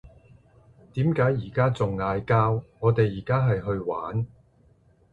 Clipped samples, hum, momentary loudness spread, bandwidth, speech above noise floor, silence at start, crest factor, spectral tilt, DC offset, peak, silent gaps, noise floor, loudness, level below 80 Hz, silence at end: under 0.1%; none; 7 LU; 7.6 kHz; 36 dB; 0.05 s; 18 dB; -9 dB/octave; under 0.1%; -8 dBFS; none; -59 dBFS; -25 LUFS; -50 dBFS; 0.85 s